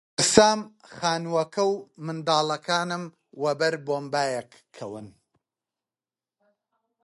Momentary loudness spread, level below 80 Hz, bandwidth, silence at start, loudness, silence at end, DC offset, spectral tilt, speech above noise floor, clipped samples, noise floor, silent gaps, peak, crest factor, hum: 20 LU; -62 dBFS; 11.5 kHz; 0.2 s; -25 LUFS; 1.95 s; under 0.1%; -3 dB/octave; over 65 dB; under 0.1%; under -90 dBFS; none; 0 dBFS; 26 dB; none